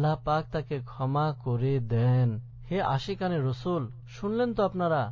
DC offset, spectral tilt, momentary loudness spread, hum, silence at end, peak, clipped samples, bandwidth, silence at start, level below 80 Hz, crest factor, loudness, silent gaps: under 0.1%; -8.5 dB/octave; 8 LU; none; 0 s; -14 dBFS; under 0.1%; 7.2 kHz; 0 s; -52 dBFS; 14 dB; -29 LUFS; none